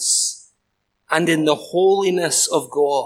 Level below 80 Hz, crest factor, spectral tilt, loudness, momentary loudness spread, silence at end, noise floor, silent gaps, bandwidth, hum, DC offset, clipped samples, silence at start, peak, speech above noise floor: -72 dBFS; 18 dB; -2.5 dB/octave; -18 LUFS; 6 LU; 0 s; -72 dBFS; none; 16 kHz; none; under 0.1%; under 0.1%; 0 s; -2 dBFS; 54 dB